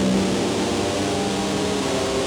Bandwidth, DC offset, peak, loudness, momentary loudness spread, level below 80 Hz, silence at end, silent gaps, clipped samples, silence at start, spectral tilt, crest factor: 18.5 kHz; under 0.1%; -10 dBFS; -22 LUFS; 2 LU; -44 dBFS; 0 s; none; under 0.1%; 0 s; -4.5 dB/octave; 12 dB